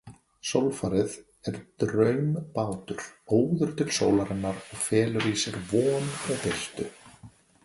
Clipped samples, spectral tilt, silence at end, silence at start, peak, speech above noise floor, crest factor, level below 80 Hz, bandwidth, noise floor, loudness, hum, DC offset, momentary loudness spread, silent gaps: under 0.1%; -5 dB/octave; 0.35 s; 0.05 s; -8 dBFS; 25 dB; 20 dB; -56 dBFS; 12 kHz; -52 dBFS; -28 LUFS; none; under 0.1%; 13 LU; none